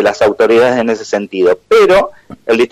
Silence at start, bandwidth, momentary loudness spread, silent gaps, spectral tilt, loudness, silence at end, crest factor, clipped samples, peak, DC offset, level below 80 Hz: 0 s; 13.5 kHz; 9 LU; none; -4.5 dB/octave; -11 LUFS; 0.05 s; 10 dB; under 0.1%; -2 dBFS; under 0.1%; -44 dBFS